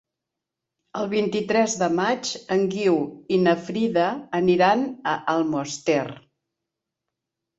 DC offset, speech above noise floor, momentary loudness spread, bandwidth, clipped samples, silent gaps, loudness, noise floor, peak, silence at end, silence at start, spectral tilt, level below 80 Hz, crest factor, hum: under 0.1%; 63 dB; 6 LU; 8.2 kHz; under 0.1%; none; -23 LUFS; -85 dBFS; -6 dBFS; 1.4 s; 0.95 s; -5 dB/octave; -66 dBFS; 18 dB; none